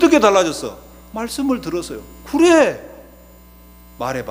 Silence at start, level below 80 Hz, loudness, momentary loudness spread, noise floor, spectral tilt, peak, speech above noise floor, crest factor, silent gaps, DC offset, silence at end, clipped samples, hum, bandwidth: 0 s; -44 dBFS; -17 LUFS; 19 LU; -44 dBFS; -4 dB/octave; 0 dBFS; 27 dB; 18 dB; none; under 0.1%; 0 s; under 0.1%; 60 Hz at -45 dBFS; 16 kHz